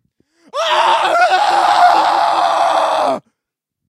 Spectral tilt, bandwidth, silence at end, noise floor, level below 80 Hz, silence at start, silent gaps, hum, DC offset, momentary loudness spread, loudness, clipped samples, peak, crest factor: -1.5 dB/octave; 14.5 kHz; 0.7 s; -80 dBFS; -66 dBFS; 0.55 s; none; none; under 0.1%; 9 LU; -13 LUFS; under 0.1%; 0 dBFS; 14 dB